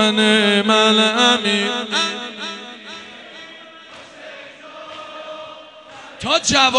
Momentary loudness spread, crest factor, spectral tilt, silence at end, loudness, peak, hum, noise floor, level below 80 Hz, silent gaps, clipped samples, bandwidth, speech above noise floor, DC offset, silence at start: 24 LU; 20 dB; -2.5 dB/octave; 0 s; -15 LUFS; 0 dBFS; none; -40 dBFS; -56 dBFS; none; under 0.1%; 10.5 kHz; 25 dB; under 0.1%; 0 s